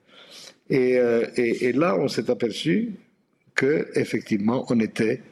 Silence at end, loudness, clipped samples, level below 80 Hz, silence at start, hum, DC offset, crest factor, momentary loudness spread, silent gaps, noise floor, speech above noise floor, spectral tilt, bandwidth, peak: 0.1 s; -23 LUFS; under 0.1%; -68 dBFS; 0.3 s; none; under 0.1%; 20 dB; 10 LU; none; -63 dBFS; 41 dB; -6 dB/octave; 12.5 kHz; -4 dBFS